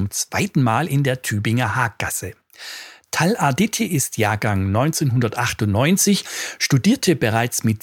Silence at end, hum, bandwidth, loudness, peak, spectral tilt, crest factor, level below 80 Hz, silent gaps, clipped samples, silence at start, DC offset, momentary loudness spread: 0.05 s; none; 19 kHz; -19 LUFS; -2 dBFS; -4.5 dB/octave; 16 dB; -52 dBFS; none; under 0.1%; 0 s; under 0.1%; 10 LU